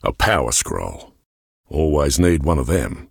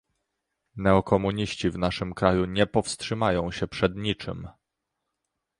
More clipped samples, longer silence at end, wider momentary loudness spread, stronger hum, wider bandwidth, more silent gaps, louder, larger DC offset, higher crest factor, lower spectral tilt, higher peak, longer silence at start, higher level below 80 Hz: neither; second, 0.05 s vs 1.1 s; about the same, 11 LU vs 10 LU; neither; first, 20 kHz vs 11 kHz; first, 1.26-1.64 s vs none; first, -19 LUFS vs -26 LUFS; neither; second, 16 dB vs 22 dB; about the same, -4.5 dB/octave vs -5.5 dB/octave; about the same, -4 dBFS vs -4 dBFS; second, 0.05 s vs 0.75 s; first, -30 dBFS vs -46 dBFS